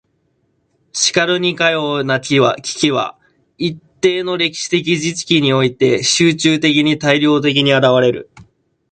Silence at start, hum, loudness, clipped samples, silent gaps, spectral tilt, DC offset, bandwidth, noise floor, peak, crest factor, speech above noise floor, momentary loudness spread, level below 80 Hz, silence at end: 0.95 s; none; -14 LUFS; under 0.1%; none; -4 dB/octave; under 0.1%; 9.4 kHz; -63 dBFS; 0 dBFS; 16 dB; 49 dB; 7 LU; -56 dBFS; 0.5 s